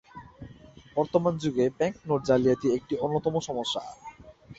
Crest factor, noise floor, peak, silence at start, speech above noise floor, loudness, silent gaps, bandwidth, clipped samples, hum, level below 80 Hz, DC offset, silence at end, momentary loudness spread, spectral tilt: 20 dB; -50 dBFS; -8 dBFS; 0.15 s; 24 dB; -27 LUFS; none; 8 kHz; under 0.1%; none; -58 dBFS; under 0.1%; 0.05 s; 23 LU; -6 dB/octave